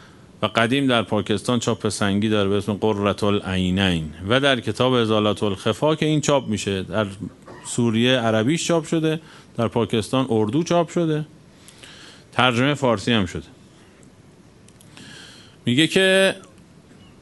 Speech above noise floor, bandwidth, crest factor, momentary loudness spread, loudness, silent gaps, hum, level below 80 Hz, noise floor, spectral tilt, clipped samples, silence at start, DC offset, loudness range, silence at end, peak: 29 dB; 11.5 kHz; 22 dB; 11 LU; -21 LUFS; none; none; -52 dBFS; -49 dBFS; -5 dB/octave; under 0.1%; 0.4 s; under 0.1%; 3 LU; 0.75 s; 0 dBFS